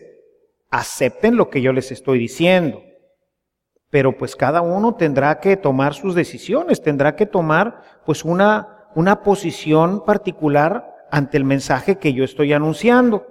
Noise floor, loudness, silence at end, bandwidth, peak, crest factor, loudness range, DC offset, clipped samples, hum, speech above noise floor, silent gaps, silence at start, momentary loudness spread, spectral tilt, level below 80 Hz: -77 dBFS; -17 LUFS; 0.05 s; 16 kHz; -2 dBFS; 16 dB; 2 LU; under 0.1%; under 0.1%; none; 60 dB; none; 0.7 s; 7 LU; -6.5 dB/octave; -50 dBFS